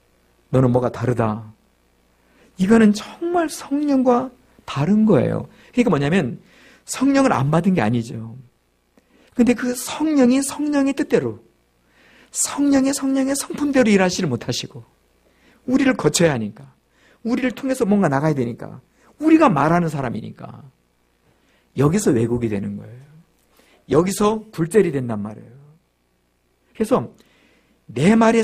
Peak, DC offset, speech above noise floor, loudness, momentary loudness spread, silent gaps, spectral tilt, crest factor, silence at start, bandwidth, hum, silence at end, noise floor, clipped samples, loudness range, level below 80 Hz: -2 dBFS; under 0.1%; 47 dB; -19 LUFS; 15 LU; none; -5.5 dB/octave; 18 dB; 0.5 s; 15.5 kHz; 60 Hz at -50 dBFS; 0 s; -65 dBFS; under 0.1%; 4 LU; -52 dBFS